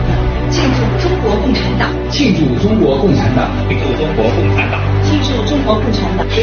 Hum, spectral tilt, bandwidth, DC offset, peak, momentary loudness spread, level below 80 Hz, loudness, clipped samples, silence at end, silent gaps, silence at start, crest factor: none; -5.5 dB/octave; 6.8 kHz; under 0.1%; 0 dBFS; 4 LU; -22 dBFS; -13 LUFS; under 0.1%; 0 s; none; 0 s; 12 dB